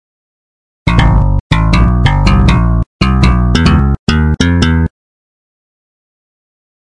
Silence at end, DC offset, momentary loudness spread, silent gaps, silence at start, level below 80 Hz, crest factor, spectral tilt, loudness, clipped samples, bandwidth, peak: 1.95 s; under 0.1%; 4 LU; 1.40-1.50 s, 2.86-2.99 s, 3.99-4.07 s; 0.85 s; -16 dBFS; 12 dB; -6.5 dB/octave; -11 LUFS; under 0.1%; 10.5 kHz; 0 dBFS